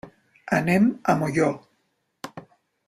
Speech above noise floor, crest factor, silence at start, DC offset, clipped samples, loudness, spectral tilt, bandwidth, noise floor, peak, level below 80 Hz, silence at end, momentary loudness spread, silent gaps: 50 dB; 20 dB; 0.05 s; under 0.1%; under 0.1%; -22 LUFS; -7 dB/octave; 15 kHz; -72 dBFS; -6 dBFS; -60 dBFS; 0.45 s; 20 LU; none